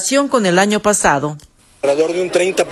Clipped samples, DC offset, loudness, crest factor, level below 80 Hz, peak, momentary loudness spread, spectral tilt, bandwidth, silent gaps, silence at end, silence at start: under 0.1%; under 0.1%; -15 LUFS; 16 dB; -46 dBFS; 0 dBFS; 8 LU; -3.5 dB/octave; 13 kHz; none; 0 s; 0 s